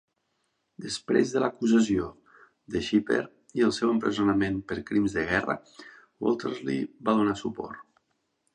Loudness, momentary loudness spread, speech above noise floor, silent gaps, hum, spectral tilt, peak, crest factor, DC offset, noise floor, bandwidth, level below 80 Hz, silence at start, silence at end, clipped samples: -27 LUFS; 11 LU; 50 dB; none; none; -5.5 dB/octave; -8 dBFS; 20 dB; under 0.1%; -76 dBFS; 10.5 kHz; -56 dBFS; 0.8 s; 0.7 s; under 0.1%